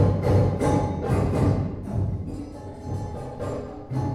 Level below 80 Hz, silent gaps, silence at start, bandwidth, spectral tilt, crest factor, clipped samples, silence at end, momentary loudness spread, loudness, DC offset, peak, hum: -38 dBFS; none; 0 s; 11.5 kHz; -8.5 dB/octave; 16 dB; under 0.1%; 0 s; 13 LU; -26 LUFS; under 0.1%; -8 dBFS; none